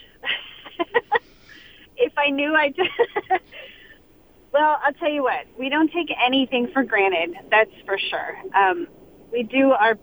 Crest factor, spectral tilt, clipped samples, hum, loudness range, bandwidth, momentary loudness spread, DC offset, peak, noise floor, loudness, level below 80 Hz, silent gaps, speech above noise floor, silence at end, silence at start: 18 dB; -5.5 dB/octave; under 0.1%; none; 3 LU; over 20 kHz; 10 LU; under 0.1%; -4 dBFS; -52 dBFS; -21 LUFS; -60 dBFS; none; 31 dB; 0.05 s; 0.25 s